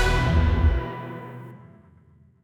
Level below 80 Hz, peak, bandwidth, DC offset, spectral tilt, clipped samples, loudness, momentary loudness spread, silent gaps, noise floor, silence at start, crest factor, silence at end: -28 dBFS; -8 dBFS; 11.5 kHz; under 0.1%; -6.5 dB/octave; under 0.1%; -23 LUFS; 20 LU; none; -55 dBFS; 0 s; 16 dB; 0.85 s